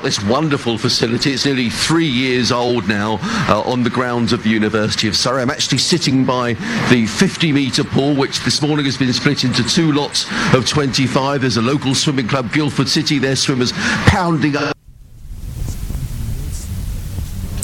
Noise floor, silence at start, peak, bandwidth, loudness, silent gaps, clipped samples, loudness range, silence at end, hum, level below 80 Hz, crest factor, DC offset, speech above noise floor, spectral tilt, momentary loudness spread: -38 dBFS; 0 s; 0 dBFS; 18.5 kHz; -16 LUFS; none; under 0.1%; 3 LU; 0 s; none; -34 dBFS; 16 dB; under 0.1%; 22 dB; -4.5 dB/octave; 12 LU